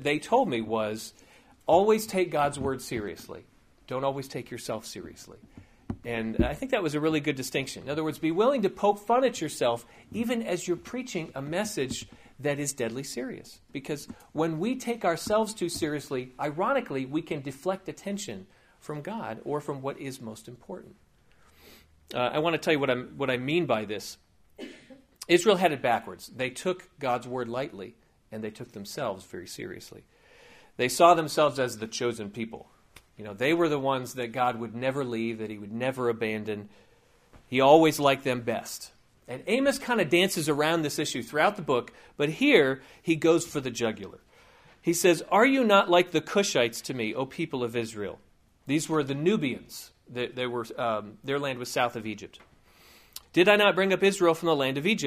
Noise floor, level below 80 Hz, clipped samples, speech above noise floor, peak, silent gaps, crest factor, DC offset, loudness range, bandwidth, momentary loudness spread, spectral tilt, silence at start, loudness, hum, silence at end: -61 dBFS; -56 dBFS; under 0.1%; 34 dB; -4 dBFS; none; 24 dB; under 0.1%; 9 LU; 15.5 kHz; 19 LU; -4.5 dB/octave; 0 s; -27 LUFS; none; 0 s